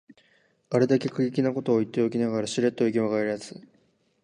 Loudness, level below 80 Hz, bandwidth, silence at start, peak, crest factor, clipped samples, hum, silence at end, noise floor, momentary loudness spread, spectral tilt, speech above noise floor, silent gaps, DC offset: -26 LUFS; -70 dBFS; 11 kHz; 0.7 s; -8 dBFS; 18 dB; under 0.1%; none; 0.65 s; -66 dBFS; 5 LU; -6.5 dB/octave; 41 dB; none; under 0.1%